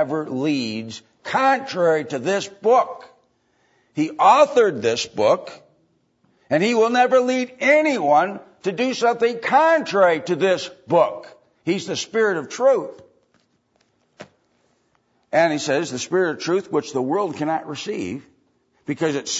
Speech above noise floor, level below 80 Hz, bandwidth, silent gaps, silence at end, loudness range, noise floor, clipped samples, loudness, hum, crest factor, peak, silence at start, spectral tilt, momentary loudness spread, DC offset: 46 dB; -70 dBFS; 8 kHz; none; 0 s; 6 LU; -65 dBFS; under 0.1%; -20 LUFS; none; 18 dB; -2 dBFS; 0 s; -4.5 dB/octave; 12 LU; under 0.1%